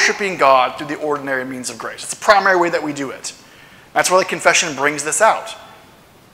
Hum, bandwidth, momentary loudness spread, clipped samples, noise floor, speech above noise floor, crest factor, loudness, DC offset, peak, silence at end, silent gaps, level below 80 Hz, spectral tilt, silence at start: none; 16.5 kHz; 13 LU; under 0.1%; -46 dBFS; 29 dB; 18 dB; -16 LUFS; under 0.1%; 0 dBFS; 0.65 s; none; -60 dBFS; -2 dB/octave; 0 s